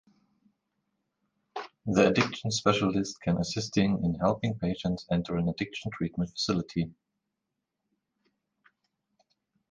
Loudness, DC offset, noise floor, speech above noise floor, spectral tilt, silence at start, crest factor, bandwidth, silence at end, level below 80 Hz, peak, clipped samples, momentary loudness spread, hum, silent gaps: -29 LUFS; under 0.1%; -85 dBFS; 56 dB; -5.5 dB/octave; 1.55 s; 22 dB; 9.8 kHz; 2.8 s; -54 dBFS; -8 dBFS; under 0.1%; 10 LU; none; none